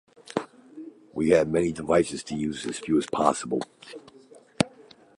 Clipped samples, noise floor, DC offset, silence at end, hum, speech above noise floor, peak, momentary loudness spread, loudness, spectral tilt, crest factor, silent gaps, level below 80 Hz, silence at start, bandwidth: under 0.1%; -53 dBFS; under 0.1%; 0.35 s; none; 28 dB; -4 dBFS; 22 LU; -26 LUFS; -5 dB/octave; 24 dB; none; -56 dBFS; 0.25 s; 11.5 kHz